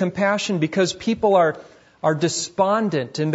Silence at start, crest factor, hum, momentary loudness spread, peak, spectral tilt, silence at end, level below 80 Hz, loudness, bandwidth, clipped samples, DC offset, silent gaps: 0 s; 16 dB; none; 6 LU; -6 dBFS; -5 dB/octave; 0 s; -60 dBFS; -21 LUFS; 8 kHz; under 0.1%; under 0.1%; none